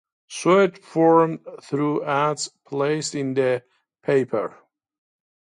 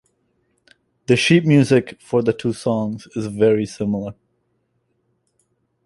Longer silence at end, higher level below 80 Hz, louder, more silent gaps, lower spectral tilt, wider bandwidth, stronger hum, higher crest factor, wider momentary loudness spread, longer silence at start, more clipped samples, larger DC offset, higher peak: second, 1.1 s vs 1.75 s; second, -72 dBFS vs -56 dBFS; second, -22 LUFS vs -18 LUFS; neither; about the same, -5.5 dB/octave vs -6 dB/octave; about the same, 11 kHz vs 11.5 kHz; neither; about the same, 18 dB vs 18 dB; about the same, 12 LU vs 13 LU; second, 0.3 s vs 1.1 s; neither; neither; about the same, -4 dBFS vs -2 dBFS